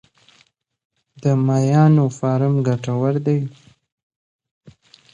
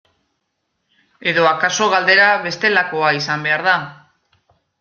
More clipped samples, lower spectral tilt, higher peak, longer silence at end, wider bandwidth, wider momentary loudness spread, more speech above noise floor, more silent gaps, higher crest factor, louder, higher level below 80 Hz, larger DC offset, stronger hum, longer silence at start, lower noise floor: neither; first, -8.5 dB/octave vs -3 dB/octave; second, -4 dBFS vs 0 dBFS; second, 0.45 s vs 0.85 s; about the same, 7.8 kHz vs 7.4 kHz; about the same, 8 LU vs 8 LU; second, 42 dB vs 56 dB; first, 3.92-4.10 s, 4.16-4.39 s, 4.51-4.61 s vs none; about the same, 16 dB vs 18 dB; second, -18 LUFS vs -15 LUFS; about the same, -62 dBFS vs -66 dBFS; neither; neither; about the same, 1.2 s vs 1.2 s; second, -59 dBFS vs -72 dBFS